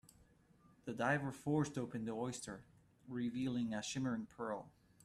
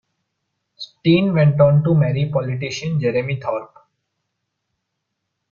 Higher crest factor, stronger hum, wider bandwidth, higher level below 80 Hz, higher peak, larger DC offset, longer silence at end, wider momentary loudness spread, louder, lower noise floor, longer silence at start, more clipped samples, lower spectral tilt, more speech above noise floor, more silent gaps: about the same, 20 dB vs 16 dB; neither; first, 13.5 kHz vs 7.2 kHz; second, -72 dBFS vs -54 dBFS; second, -22 dBFS vs -2 dBFS; neither; second, 0.35 s vs 1.85 s; about the same, 12 LU vs 12 LU; second, -41 LUFS vs -18 LUFS; second, -69 dBFS vs -77 dBFS; about the same, 0.85 s vs 0.8 s; neither; second, -5.5 dB/octave vs -7.5 dB/octave; second, 28 dB vs 60 dB; neither